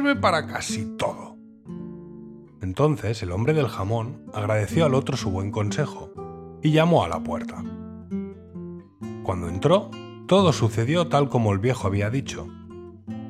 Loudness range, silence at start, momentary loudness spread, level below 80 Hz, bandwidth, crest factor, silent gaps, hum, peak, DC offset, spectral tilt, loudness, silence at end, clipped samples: 5 LU; 0 s; 19 LU; -56 dBFS; 14 kHz; 20 dB; none; none; -6 dBFS; under 0.1%; -6.5 dB/octave; -24 LUFS; 0 s; under 0.1%